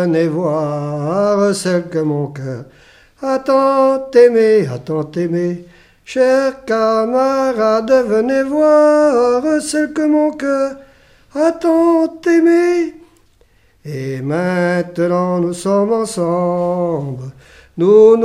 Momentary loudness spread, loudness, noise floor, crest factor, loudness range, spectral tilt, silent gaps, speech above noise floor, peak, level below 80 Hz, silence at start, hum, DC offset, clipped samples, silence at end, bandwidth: 12 LU; -15 LUFS; -52 dBFS; 14 dB; 4 LU; -6.5 dB/octave; none; 38 dB; 0 dBFS; -54 dBFS; 0 s; none; under 0.1%; under 0.1%; 0 s; 13.5 kHz